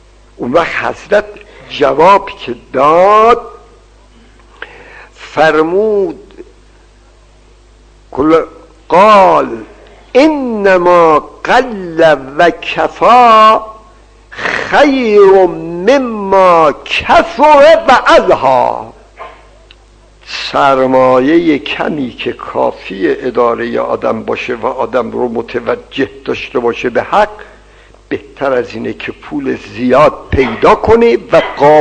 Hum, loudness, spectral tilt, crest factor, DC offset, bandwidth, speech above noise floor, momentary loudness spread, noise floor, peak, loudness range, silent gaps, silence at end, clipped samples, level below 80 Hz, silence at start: 50 Hz at -45 dBFS; -10 LUFS; -5.5 dB/octave; 10 dB; under 0.1%; 9.4 kHz; 33 dB; 14 LU; -42 dBFS; 0 dBFS; 8 LU; none; 0 s; 2%; -38 dBFS; 0.4 s